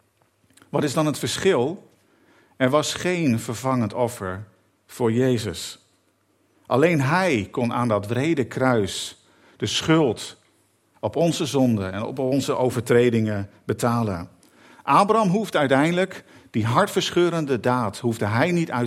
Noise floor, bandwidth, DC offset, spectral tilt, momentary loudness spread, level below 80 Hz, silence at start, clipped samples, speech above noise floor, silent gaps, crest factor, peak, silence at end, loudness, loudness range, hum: -65 dBFS; 15.5 kHz; under 0.1%; -5.5 dB/octave; 11 LU; -62 dBFS; 0.75 s; under 0.1%; 43 dB; none; 20 dB; -2 dBFS; 0 s; -22 LUFS; 4 LU; none